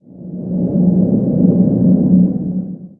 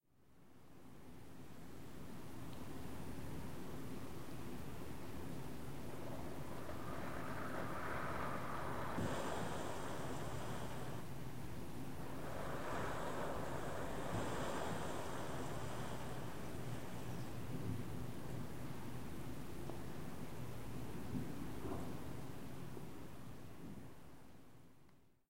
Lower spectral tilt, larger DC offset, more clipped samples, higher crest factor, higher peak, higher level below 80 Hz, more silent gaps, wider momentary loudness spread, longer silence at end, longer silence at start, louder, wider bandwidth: first, -15.5 dB/octave vs -5.5 dB/octave; second, under 0.1% vs 0.6%; neither; about the same, 14 dB vs 18 dB; first, 0 dBFS vs -28 dBFS; first, -42 dBFS vs -60 dBFS; neither; about the same, 11 LU vs 12 LU; first, 0.15 s vs 0 s; about the same, 0.1 s vs 0 s; first, -14 LUFS vs -48 LUFS; second, 1.2 kHz vs 16 kHz